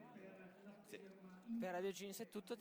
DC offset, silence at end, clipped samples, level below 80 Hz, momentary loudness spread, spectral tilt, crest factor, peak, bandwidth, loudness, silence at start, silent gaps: under 0.1%; 0 s; under 0.1%; under -90 dBFS; 15 LU; -4.5 dB/octave; 16 dB; -36 dBFS; over 20 kHz; -50 LUFS; 0 s; none